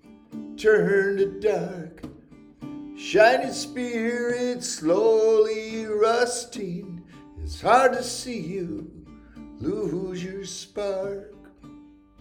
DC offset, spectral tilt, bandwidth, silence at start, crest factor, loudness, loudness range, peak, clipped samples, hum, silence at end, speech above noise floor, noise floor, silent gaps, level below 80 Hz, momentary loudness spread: under 0.1%; -4.5 dB/octave; 15.5 kHz; 0.1 s; 22 dB; -24 LUFS; 9 LU; -4 dBFS; under 0.1%; none; 0.35 s; 26 dB; -49 dBFS; none; -52 dBFS; 21 LU